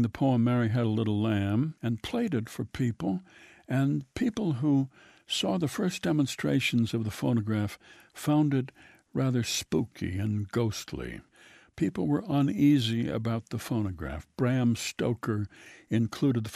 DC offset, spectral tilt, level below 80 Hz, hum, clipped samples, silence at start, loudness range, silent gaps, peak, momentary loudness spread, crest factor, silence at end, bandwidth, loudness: under 0.1%; -6 dB/octave; -56 dBFS; none; under 0.1%; 0 s; 3 LU; none; -14 dBFS; 10 LU; 16 dB; 0 s; 14.5 kHz; -29 LUFS